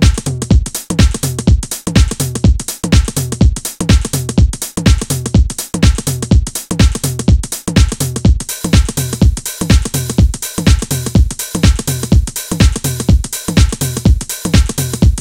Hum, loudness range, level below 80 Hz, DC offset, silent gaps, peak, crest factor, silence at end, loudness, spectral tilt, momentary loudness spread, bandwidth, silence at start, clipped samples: none; 0 LU; -16 dBFS; 0.2%; none; 0 dBFS; 12 dB; 0 s; -14 LUFS; -5 dB/octave; 4 LU; 17 kHz; 0 s; under 0.1%